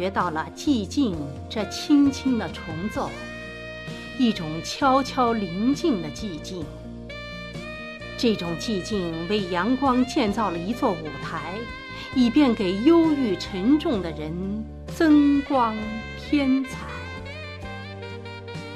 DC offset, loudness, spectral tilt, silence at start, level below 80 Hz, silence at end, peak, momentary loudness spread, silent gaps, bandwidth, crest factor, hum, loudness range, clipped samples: under 0.1%; -24 LUFS; -5.5 dB/octave; 0 s; -44 dBFS; 0 s; -6 dBFS; 16 LU; none; 13 kHz; 18 dB; none; 6 LU; under 0.1%